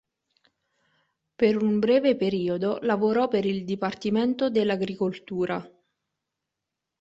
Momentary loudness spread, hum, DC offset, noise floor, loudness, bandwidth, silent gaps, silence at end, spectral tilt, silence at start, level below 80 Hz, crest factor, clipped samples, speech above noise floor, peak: 8 LU; none; under 0.1%; -85 dBFS; -25 LUFS; 7.8 kHz; none; 1.35 s; -7.5 dB/octave; 1.4 s; -66 dBFS; 18 dB; under 0.1%; 61 dB; -8 dBFS